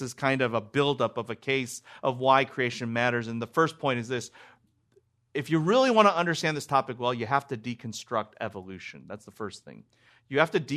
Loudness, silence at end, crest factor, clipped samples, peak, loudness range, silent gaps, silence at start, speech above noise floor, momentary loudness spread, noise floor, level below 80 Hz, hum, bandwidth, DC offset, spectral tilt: -27 LUFS; 0 s; 24 dB; under 0.1%; -4 dBFS; 7 LU; none; 0 s; 39 dB; 17 LU; -67 dBFS; -72 dBFS; none; 13.5 kHz; under 0.1%; -5 dB/octave